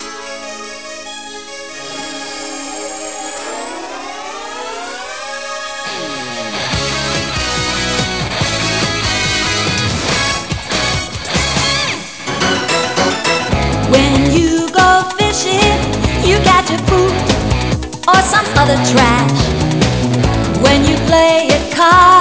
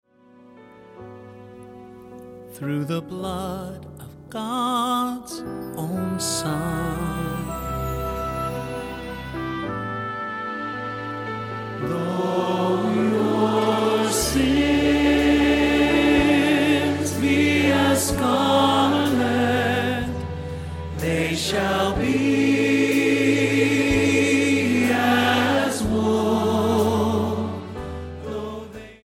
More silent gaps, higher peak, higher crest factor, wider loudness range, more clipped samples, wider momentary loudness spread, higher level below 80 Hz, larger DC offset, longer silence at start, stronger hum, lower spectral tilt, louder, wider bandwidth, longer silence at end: neither; first, 0 dBFS vs -6 dBFS; about the same, 14 dB vs 16 dB; about the same, 12 LU vs 10 LU; neither; about the same, 15 LU vs 14 LU; first, -28 dBFS vs -40 dBFS; first, 0.8% vs under 0.1%; second, 0 s vs 0.55 s; neither; about the same, -4 dB/octave vs -5 dB/octave; first, -13 LUFS vs -21 LUFS; second, 8 kHz vs 17 kHz; about the same, 0 s vs 0.1 s